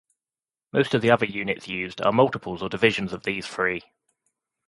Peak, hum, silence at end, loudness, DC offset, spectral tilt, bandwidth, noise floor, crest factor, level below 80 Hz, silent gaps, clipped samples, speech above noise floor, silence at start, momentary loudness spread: -4 dBFS; none; 0.85 s; -24 LUFS; under 0.1%; -6 dB/octave; 11.5 kHz; under -90 dBFS; 22 dB; -58 dBFS; none; under 0.1%; over 66 dB; 0.75 s; 10 LU